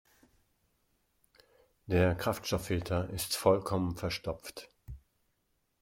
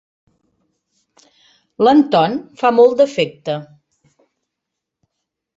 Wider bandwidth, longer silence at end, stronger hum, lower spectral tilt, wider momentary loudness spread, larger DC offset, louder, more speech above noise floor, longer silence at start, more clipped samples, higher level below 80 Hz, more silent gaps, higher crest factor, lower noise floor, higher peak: first, 16.5 kHz vs 7.8 kHz; second, 0.85 s vs 1.9 s; neither; second, -5 dB/octave vs -6.5 dB/octave; first, 22 LU vs 14 LU; neither; second, -32 LUFS vs -15 LUFS; second, 46 dB vs 66 dB; about the same, 1.9 s vs 1.8 s; neither; first, -56 dBFS vs -64 dBFS; neither; first, 24 dB vs 16 dB; about the same, -78 dBFS vs -80 dBFS; second, -12 dBFS vs -2 dBFS